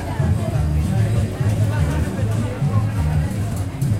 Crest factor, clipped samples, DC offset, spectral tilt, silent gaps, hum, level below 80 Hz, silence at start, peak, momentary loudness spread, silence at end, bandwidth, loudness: 14 dB; under 0.1%; under 0.1%; -7.5 dB/octave; none; none; -28 dBFS; 0 s; -6 dBFS; 3 LU; 0 s; 15 kHz; -21 LUFS